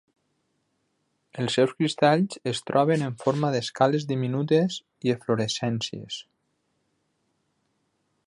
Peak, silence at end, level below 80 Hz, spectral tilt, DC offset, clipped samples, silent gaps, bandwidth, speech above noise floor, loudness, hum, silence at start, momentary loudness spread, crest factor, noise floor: -6 dBFS; 2.05 s; -68 dBFS; -5.5 dB/octave; under 0.1%; under 0.1%; none; 11.5 kHz; 49 dB; -25 LUFS; none; 1.35 s; 10 LU; 22 dB; -74 dBFS